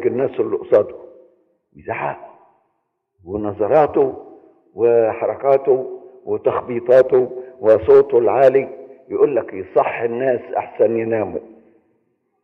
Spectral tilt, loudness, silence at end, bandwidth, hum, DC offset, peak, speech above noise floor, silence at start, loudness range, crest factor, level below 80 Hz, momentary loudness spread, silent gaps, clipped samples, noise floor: -9 dB/octave; -17 LUFS; 1 s; 4.8 kHz; none; under 0.1%; -4 dBFS; 55 dB; 0 s; 7 LU; 14 dB; -56 dBFS; 15 LU; none; under 0.1%; -71 dBFS